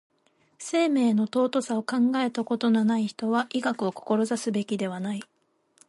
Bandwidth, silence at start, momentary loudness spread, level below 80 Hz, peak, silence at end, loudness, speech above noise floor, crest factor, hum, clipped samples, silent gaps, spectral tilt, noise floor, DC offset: 11.5 kHz; 0.6 s; 8 LU; -76 dBFS; -12 dBFS; 0.65 s; -26 LUFS; 41 dB; 14 dB; none; under 0.1%; none; -5.5 dB/octave; -66 dBFS; under 0.1%